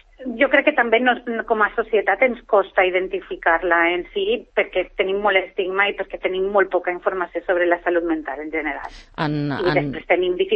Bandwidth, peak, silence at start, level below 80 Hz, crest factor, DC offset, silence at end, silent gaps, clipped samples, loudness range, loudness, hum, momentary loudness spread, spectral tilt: 6 kHz; -4 dBFS; 0.2 s; -50 dBFS; 16 dB; under 0.1%; 0 s; none; under 0.1%; 3 LU; -20 LUFS; none; 8 LU; -7.5 dB/octave